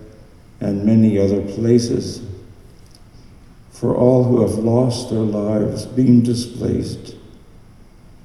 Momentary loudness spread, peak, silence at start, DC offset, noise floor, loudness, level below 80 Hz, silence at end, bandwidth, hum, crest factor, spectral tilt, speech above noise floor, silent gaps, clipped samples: 15 LU; 0 dBFS; 0 s; under 0.1%; -43 dBFS; -17 LUFS; -46 dBFS; 0.9 s; 12 kHz; none; 18 dB; -7.5 dB/octave; 27 dB; none; under 0.1%